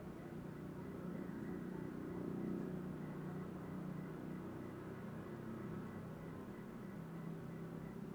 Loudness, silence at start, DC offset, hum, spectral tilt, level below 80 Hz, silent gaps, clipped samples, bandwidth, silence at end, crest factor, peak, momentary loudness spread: -48 LUFS; 0 s; under 0.1%; none; -8.5 dB/octave; -68 dBFS; none; under 0.1%; over 20 kHz; 0 s; 16 dB; -32 dBFS; 5 LU